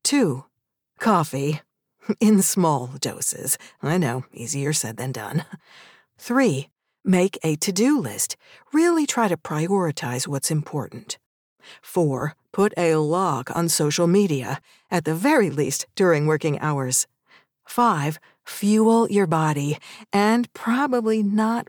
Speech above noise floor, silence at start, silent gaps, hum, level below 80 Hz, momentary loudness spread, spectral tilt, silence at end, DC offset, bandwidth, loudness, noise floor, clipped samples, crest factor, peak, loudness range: 53 dB; 0.05 s; 11.26-11.56 s; none; -70 dBFS; 11 LU; -5 dB/octave; 0.05 s; under 0.1%; over 20 kHz; -22 LUFS; -74 dBFS; under 0.1%; 16 dB; -6 dBFS; 4 LU